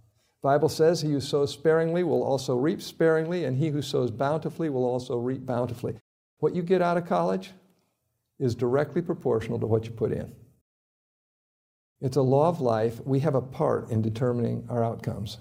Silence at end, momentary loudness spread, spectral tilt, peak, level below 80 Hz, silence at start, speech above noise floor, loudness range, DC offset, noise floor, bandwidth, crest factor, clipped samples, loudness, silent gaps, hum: 0 s; 7 LU; -7 dB/octave; -10 dBFS; -62 dBFS; 0.45 s; 51 dB; 4 LU; under 0.1%; -77 dBFS; 16 kHz; 18 dB; under 0.1%; -27 LUFS; 6.01-6.37 s, 10.61-11.96 s; none